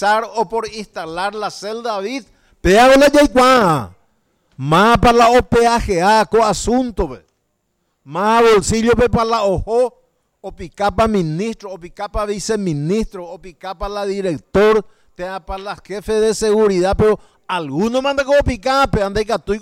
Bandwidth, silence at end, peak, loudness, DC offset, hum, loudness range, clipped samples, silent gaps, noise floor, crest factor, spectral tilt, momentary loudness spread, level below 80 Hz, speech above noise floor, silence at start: 17 kHz; 0 s; -4 dBFS; -15 LUFS; under 0.1%; none; 8 LU; under 0.1%; none; -68 dBFS; 10 dB; -5 dB/octave; 17 LU; -34 dBFS; 53 dB; 0 s